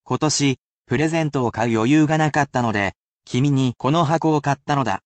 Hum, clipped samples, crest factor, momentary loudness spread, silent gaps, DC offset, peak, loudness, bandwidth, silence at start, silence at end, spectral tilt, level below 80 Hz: none; under 0.1%; 14 dB; 6 LU; 0.58-0.85 s, 2.96-3.20 s; under 0.1%; -6 dBFS; -20 LUFS; 9 kHz; 0.1 s; 0.1 s; -5.5 dB/octave; -54 dBFS